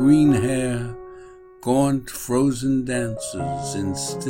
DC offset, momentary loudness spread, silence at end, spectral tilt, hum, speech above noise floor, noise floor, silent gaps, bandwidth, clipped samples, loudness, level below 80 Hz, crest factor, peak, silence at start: under 0.1%; 12 LU; 0 s; -6 dB/octave; none; 23 dB; -43 dBFS; none; 16.5 kHz; under 0.1%; -22 LUFS; -46 dBFS; 16 dB; -6 dBFS; 0 s